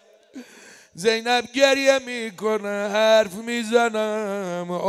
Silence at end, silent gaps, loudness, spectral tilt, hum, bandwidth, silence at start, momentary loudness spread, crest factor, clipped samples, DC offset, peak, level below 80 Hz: 0 s; none; -21 LUFS; -3 dB/octave; none; 15 kHz; 0.35 s; 10 LU; 18 dB; under 0.1%; under 0.1%; -4 dBFS; -70 dBFS